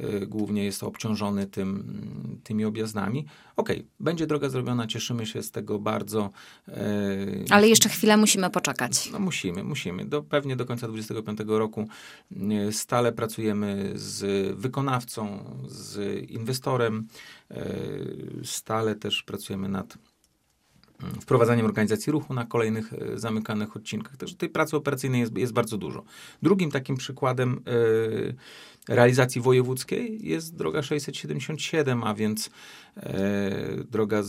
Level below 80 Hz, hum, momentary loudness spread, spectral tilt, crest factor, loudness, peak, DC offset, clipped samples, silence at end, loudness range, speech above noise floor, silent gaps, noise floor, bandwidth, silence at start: -64 dBFS; none; 14 LU; -4.5 dB/octave; 26 dB; -27 LUFS; 0 dBFS; under 0.1%; under 0.1%; 0 s; 9 LU; 41 dB; none; -68 dBFS; 16 kHz; 0 s